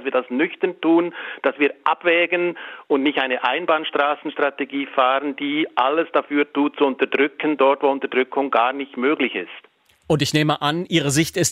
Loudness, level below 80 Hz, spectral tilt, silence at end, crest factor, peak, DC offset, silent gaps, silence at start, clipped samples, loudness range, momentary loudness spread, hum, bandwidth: -20 LUFS; -60 dBFS; -4.5 dB/octave; 0 s; 18 dB; -2 dBFS; under 0.1%; none; 0 s; under 0.1%; 1 LU; 6 LU; none; 16 kHz